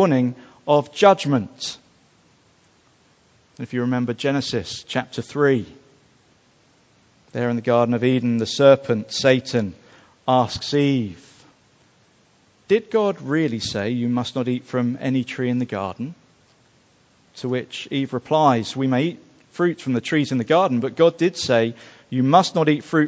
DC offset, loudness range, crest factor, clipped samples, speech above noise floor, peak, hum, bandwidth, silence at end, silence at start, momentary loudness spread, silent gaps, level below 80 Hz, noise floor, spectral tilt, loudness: under 0.1%; 7 LU; 22 dB; under 0.1%; 38 dB; 0 dBFS; none; 8 kHz; 0 s; 0 s; 13 LU; none; -58 dBFS; -58 dBFS; -6 dB/octave; -21 LUFS